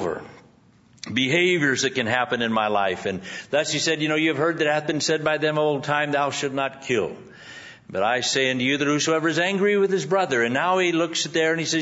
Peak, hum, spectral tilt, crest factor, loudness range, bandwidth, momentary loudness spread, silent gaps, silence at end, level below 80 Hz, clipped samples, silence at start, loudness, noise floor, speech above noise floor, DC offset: -4 dBFS; none; -3.5 dB/octave; 18 dB; 3 LU; 8 kHz; 9 LU; none; 0 s; -66 dBFS; under 0.1%; 0 s; -22 LUFS; -55 dBFS; 33 dB; under 0.1%